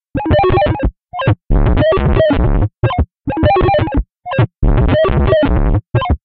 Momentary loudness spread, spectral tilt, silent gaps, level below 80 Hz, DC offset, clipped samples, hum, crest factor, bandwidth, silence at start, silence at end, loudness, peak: 7 LU; -6.5 dB/octave; none; -18 dBFS; under 0.1%; under 0.1%; none; 12 dB; 4.7 kHz; 0.15 s; 0.1 s; -14 LUFS; 0 dBFS